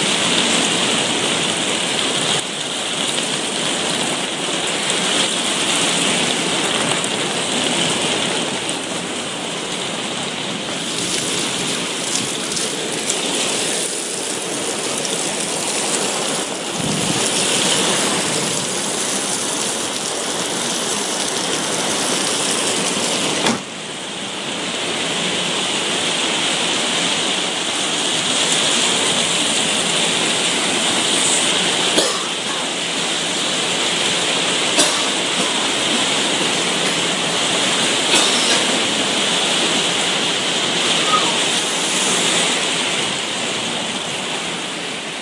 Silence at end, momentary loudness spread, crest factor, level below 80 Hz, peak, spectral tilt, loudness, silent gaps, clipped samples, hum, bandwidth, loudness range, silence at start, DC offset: 0 s; 7 LU; 20 dB; -62 dBFS; 0 dBFS; -1 dB/octave; -17 LUFS; none; under 0.1%; none; 11.5 kHz; 4 LU; 0 s; under 0.1%